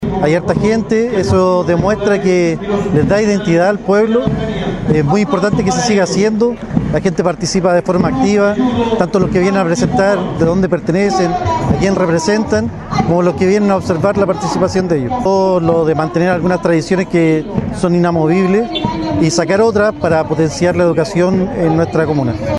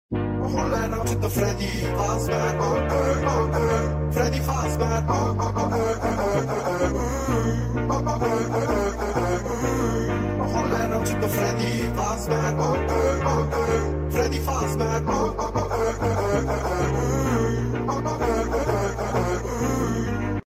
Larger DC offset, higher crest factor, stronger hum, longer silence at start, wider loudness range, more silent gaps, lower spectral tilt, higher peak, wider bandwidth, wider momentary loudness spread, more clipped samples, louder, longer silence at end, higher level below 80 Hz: neither; about the same, 12 dB vs 16 dB; neither; about the same, 0 s vs 0.1 s; about the same, 1 LU vs 1 LU; neither; about the same, -6.5 dB/octave vs -6 dB/octave; first, 0 dBFS vs -8 dBFS; second, 11.5 kHz vs 16 kHz; about the same, 3 LU vs 3 LU; neither; first, -13 LUFS vs -24 LUFS; about the same, 0 s vs 0.1 s; about the same, -36 dBFS vs -34 dBFS